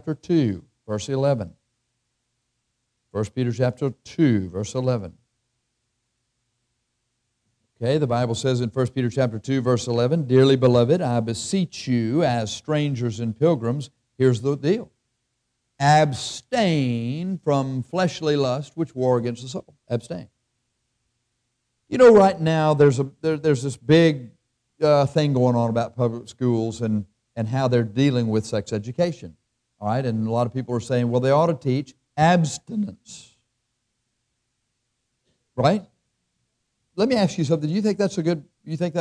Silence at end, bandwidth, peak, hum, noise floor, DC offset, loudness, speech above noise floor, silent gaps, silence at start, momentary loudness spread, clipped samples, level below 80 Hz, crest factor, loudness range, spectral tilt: 0 s; 11 kHz; -6 dBFS; none; -76 dBFS; under 0.1%; -22 LUFS; 55 dB; none; 0.05 s; 12 LU; under 0.1%; -60 dBFS; 16 dB; 9 LU; -6.5 dB/octave